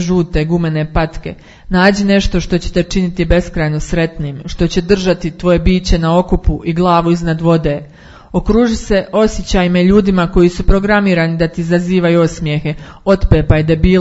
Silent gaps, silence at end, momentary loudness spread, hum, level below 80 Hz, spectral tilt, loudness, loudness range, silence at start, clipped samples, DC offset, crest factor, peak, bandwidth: none; 0 s; 7 LU; none; -22 dBFS; -6.5 dB/octave; -13 LUFS; 3 LU; 0 s; under 0.1%; under 0.1%; 12 dB; 0 dBFS; 8 kHz